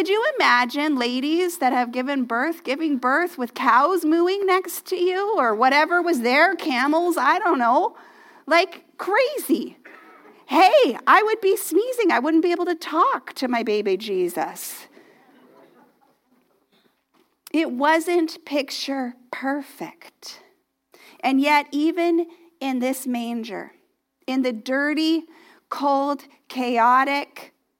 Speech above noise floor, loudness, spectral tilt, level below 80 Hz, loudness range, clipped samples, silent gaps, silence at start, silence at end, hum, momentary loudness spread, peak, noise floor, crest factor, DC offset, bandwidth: 46 dB; -21 LUFS; -3 dB/octave; -86 dBFS; 8 LU; under 0.1%; none; 0 s; 0.35 s; none; 13 LU; -2 dBFS; -67 dBFS; 20 dB; under 0.1%; 17 kHz